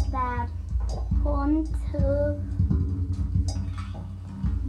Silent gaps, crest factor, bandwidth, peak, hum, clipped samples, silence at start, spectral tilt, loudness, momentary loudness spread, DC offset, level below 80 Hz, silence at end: none; 14 dB; 9.4 kHz; -12 dBFS; none; under 0.1%; 0 s; -8.5 dB/octave; -28 LUFS; 8 LU; under 0.1%; -30 dBFS; 0 s